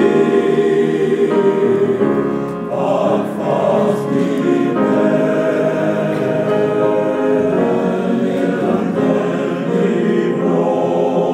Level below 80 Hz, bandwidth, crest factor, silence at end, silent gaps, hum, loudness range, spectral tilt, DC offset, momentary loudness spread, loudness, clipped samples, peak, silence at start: -56 dBFS; 11.5 kHz; 12 dB; 0 s; none; none; 1 LU; -7.5 dB/octave; under 0.1%; 3 LU; -16 LUFS; under 0.1%; -2 dBFS; 0 s